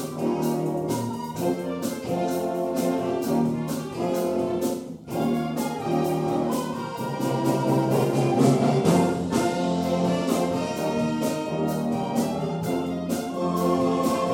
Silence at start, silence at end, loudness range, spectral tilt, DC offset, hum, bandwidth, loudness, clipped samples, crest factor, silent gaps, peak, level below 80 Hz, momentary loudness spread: 0 s; 0 s; 4 LU; -6.5 dB/octave; under 0.1%; none; 17 kHz; -25 LUFS; under 0.1%; 18 dB; none; -6 dBFS; -58 dBFS; 7 LU